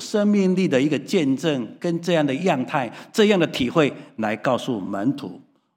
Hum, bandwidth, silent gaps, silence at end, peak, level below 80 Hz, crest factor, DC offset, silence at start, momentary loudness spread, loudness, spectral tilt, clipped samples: none; 16 kHz; none; 0.35 s; -2 dBFS; -62 dBFS; 18 dB; under 0.1%; 0 s; 8 LU; -22 LUFS; -6 dB/octave; under 0.1%